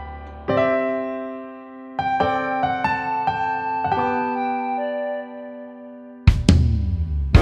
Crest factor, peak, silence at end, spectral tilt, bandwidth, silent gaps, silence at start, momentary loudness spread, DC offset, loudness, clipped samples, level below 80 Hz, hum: 22 dB; 0 dBFS; 0 s; -7 dB/octave; 9.8 kHz; none; 0 s; 18 LU; under 0.1%; -22 LUFS; under 0.1%; -30 dBFS; none